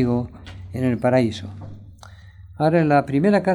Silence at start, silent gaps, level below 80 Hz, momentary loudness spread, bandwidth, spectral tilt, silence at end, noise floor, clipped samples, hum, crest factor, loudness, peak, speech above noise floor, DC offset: 0 s; none; -48 dBFS; 20 LU; 12 kHz; -8 dB/octave; 0 s; -43 dBFS; under 0.1%; none; 16 dB; -20 LUFS; -4 dBFS; 24 dB; under 0.1%